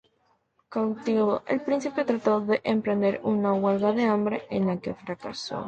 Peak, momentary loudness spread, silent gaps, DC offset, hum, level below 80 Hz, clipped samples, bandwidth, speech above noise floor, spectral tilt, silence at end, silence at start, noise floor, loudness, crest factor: -10 dBFS; 10 LU; none; under 0.1%; none; -64 dBFS; under 0.1%; 8.6 kHz; 44 dB; -7 dB/octave; 0 s; 0.7 s; -69 dBFS; -26 LUFS; 16 dB